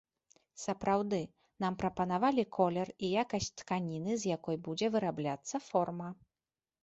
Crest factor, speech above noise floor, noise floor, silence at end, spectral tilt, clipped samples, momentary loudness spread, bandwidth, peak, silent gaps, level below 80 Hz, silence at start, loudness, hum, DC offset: 20 dB; over 56 dB; under -90 dBFS; 0.7 s; -5.5 dB/octave; under 0.1%; 8 LU; 8 kHz; -16 dBFS; none; -66 dBFS; 0.55 s; -35 LUFS; none; under 0.1%